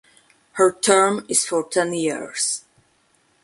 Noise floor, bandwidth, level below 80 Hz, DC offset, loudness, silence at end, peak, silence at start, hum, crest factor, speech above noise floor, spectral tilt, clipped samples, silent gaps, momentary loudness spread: -62 dBFS; 12 kHz; -68 dBFS; under 0.1%; -20 LUFS; 0.85 s; -2 dBFS; 0.55 s; none; 20 dB; 42 dB; -2.5 dB/octave; under 0.1%; none; 9 LU